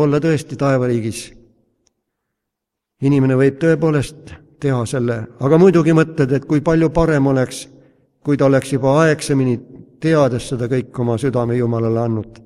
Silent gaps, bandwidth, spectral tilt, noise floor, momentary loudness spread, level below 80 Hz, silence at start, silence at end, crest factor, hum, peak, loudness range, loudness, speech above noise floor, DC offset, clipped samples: none; 12.5 kHz; -7 dB/octave; -80 dBFS; 9 LU; -42 dBFS; 0 s; 0.15 s; 16 dB; none; 0 dBFS; 4 LU; -16 LUFS; 65 dB; under 0.1%; under 0.1%